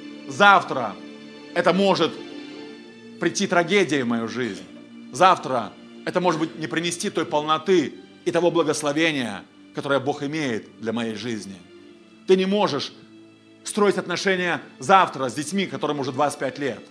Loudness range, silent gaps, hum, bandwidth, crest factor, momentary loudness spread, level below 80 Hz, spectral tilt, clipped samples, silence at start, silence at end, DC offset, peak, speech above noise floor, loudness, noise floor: 4 LU; none; none; 11 kHz; 24 dB; 19 LU; -72 dBFS; -4.5 dB/octave; under 0.1%; 0 s; 0.05 s; under 0.1%; 0 dBFS; 27 dB; -22 LUFS; -49 dBFS